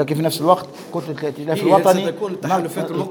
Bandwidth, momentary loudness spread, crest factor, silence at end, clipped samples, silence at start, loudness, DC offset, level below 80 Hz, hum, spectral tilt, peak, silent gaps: over 20 kHz; 12 LU; 18 dB; 0 s; under 0.1%; 0 s; -19 LUFS; under 0.1%; -66 dBFS; none; -5.5 dB/octave; 0 dBFS; none